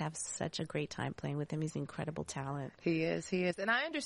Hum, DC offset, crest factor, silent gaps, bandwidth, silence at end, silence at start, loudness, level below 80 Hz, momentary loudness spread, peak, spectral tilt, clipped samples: none; under 0.1%; 18 dB; none; 11.5 kHz; 0 s; 0 s; -37 LUFS; -66 dBFS; 8 LU; -20 dBFS; -4.5 dB/octave; under 0.1%